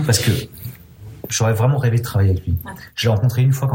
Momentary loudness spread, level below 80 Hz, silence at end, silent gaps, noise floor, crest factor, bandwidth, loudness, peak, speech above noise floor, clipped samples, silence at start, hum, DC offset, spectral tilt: 18 LU; -44 dBFS; 0 s; none; -39 dBFS; 14 dB; 16.5 kHz; -18 LUFS; -4 dBFS; 21 dB; under 0.1%; 0 s; none; under 0.1%; -5 dB/octave